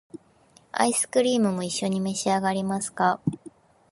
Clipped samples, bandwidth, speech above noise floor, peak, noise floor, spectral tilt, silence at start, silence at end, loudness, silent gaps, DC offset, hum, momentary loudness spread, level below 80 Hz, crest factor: under 0.1%; 11.5 kHz; 34 dB; -6 dBFS; -58 dBFS; -4 dB/octave; 0.15 s; 0.55 s; -25 LUFS; none; under 0.1%; none; 8 LU; -64 dBFS; 20 dB